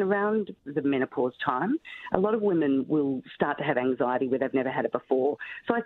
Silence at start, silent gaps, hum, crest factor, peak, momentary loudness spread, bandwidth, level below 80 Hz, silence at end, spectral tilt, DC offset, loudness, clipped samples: 0 s; none; none; 22 dB; -6 dBFS; 6 LU; 4.2 kHz; -66 dBFS; 0 s; -9.5 dB/octave; under 0.1%; -27 LUFS; under 0.1%